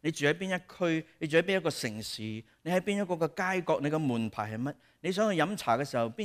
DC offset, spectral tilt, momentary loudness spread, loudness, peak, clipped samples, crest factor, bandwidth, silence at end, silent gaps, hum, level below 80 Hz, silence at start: under 0.1%; -5 dB/octave; 9 LU; -31 LUFS; -14 dBFS; under 0.1%; 18 dB; 15.5 kHz; 0 s; none; none; -70 dBFS; 0.05 s